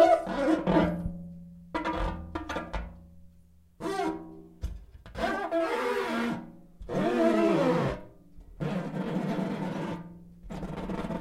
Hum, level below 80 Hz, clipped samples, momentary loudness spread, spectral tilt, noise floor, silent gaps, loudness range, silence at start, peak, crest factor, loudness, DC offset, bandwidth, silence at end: none; -46 dBFS; under 0.1%; 19 LU; -7 dB/octave; -57 dBFS; none; 8 LU; 0 s; -8 dBFS; 22 dB; -30 LUFS; under 0.1%; 15 kHz; 0 s